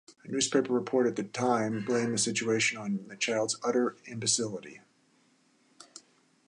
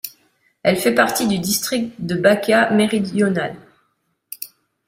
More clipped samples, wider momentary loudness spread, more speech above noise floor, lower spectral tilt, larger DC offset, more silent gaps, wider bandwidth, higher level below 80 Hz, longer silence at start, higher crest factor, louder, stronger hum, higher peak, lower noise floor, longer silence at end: neither; second, 10 LU vs 17 LU; second, 37 dB vs 51 dB; second, -3 dB/octave vs -4.5 dB/octave; neither; neither; second, 11.5 kHz vs 16 kHz; second, -76 dBFS vs -58 dBFS; about the same, 0.1 s vs 0.05 s; about the same, 18 dB vs 18 dB; second, -29 LUFS vs -18 LUFS; neither; second, -12 dBFS vs -2 dBFS; about the same, -67 dBFS vs -68 dBFS; about the same, 0.5 s vs 0.4 s